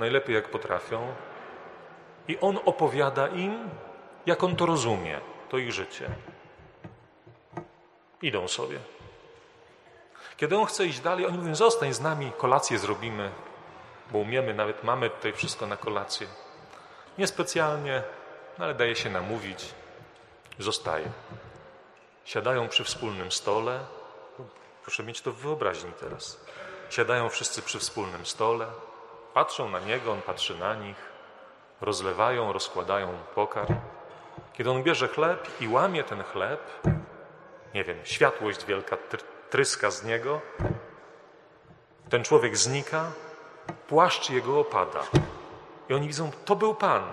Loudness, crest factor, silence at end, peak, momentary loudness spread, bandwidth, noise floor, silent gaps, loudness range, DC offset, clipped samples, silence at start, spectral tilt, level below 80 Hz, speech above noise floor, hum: -28 LUFS; 24 dB; 0 s; -6 dBFS; 21 LU; 13 kHz; -58 dBFS; none; 7 LU; under 0.1%; under 0.1%; 0 s; -4 dB/octave; -56 dBFS; 30 dB; none